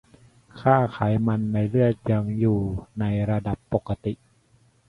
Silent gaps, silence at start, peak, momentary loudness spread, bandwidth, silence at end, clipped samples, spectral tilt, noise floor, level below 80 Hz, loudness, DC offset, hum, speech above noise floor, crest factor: none; 0.55 s; -4 dBFS; 9 LU; 4.9 kHz; 0.75 s; under 0.1%; -10 dB/octave; -60 dBFS; -46 dBFS; -24 LUFS; under 0.1%; none; 38 dB; 20 dB